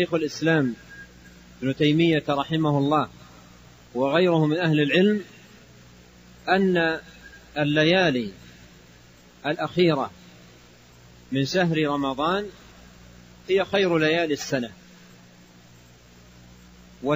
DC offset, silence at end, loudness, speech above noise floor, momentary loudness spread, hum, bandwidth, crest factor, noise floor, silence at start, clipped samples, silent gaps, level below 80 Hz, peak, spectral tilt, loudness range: under 0.1%; 0 s; -23 LUFS; 29 dB; 15 LU; 60 Hz at -50 dBFS; 15.5 kHz; 20 dB; -51 dBFS; 0 s; under 0.1%; none; -56 dBFS; -6 dBFS; -6 dB/octave; 5 LU